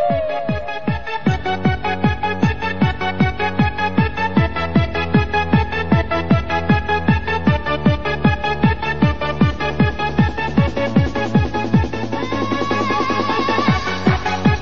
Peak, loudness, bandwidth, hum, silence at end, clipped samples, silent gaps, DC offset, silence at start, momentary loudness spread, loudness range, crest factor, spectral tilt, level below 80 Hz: -2 dBFS; -18 LUFS; 7 kHz; none; 0 s; under 0.1%; none; 3%; 0 s; 3 LU; 1 LU; 16 dB; -7 dB/octave; -30 dBFS